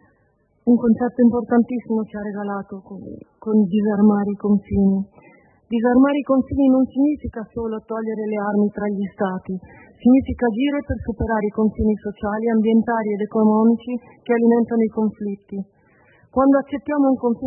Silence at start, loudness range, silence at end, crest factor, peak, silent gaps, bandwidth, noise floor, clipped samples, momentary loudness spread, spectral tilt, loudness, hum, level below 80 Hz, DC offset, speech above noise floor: 0.65 s; 2 LU; 0 s; 14 dB; -6 dBFS; none; 3.2 kHz; -62 dBFS; under 0.1%; 14 LU; -12.5 dB/octave; -20 LUFS; none; -44 dBFS; under 0.1%; 43 dB